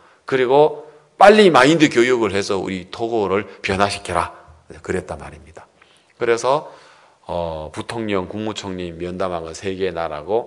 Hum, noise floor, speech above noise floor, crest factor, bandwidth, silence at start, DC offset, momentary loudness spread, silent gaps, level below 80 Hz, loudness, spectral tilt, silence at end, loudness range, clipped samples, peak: none; -53 dBFS; 35 dB; 18 dB; 12 kHz; 0.3 s; under 0.1%; 16 LU; none; -52 dBFS; -18 LUFS; -5 dB/octave; 0 s; 10 LU; under 0.1%; 0 dBFS